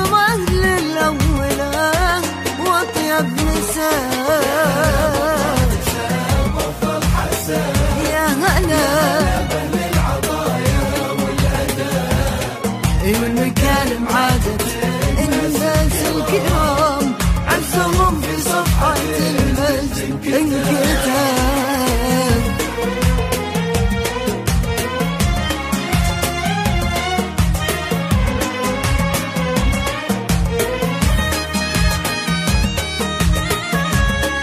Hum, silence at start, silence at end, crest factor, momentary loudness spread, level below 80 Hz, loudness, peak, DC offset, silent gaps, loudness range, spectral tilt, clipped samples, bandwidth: none; 0 s; 0 s; 14 dB; 4 LU; -24 dBFS; -17 LUFS; -2 dBFS; under 0.1%; none; 2 LU; -4.5 dB/octave; under 0.1%; 15.5 kHz